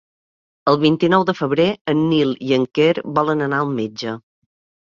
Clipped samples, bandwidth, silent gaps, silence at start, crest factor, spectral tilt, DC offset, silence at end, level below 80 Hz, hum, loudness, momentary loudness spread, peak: under 0.1%; 7.2 kHz; 1.81-1.85 s; 0.65 s; 18 dB; -7 dB/octave; under 0.1%; 0.65 s; -58 dBFS; none; -18 LUFS; 8 LU; -2 dBFS